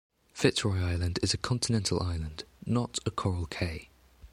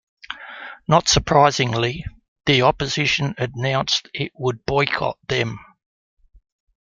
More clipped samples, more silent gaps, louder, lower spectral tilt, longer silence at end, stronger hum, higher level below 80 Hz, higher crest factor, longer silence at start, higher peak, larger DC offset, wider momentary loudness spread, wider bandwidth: neither; second, none vs 2.28-2.36 s; second, -31 LUFS vs -20 LUFS; about the same, -4.5 dB/octave vs -4 dB/octave; second, 0.05 s vs 1.3 s; neither; about the same, -46 dBFS vs -44 dBFS; about the same, 22 dB vs 20 dB; about the same, 0.35 s vs 0.3 s; second, -8 dBFS vs 0 dBFS; neither; second, 10 LU vs 18 LU; first, 14 kHz vs 9.4 kHz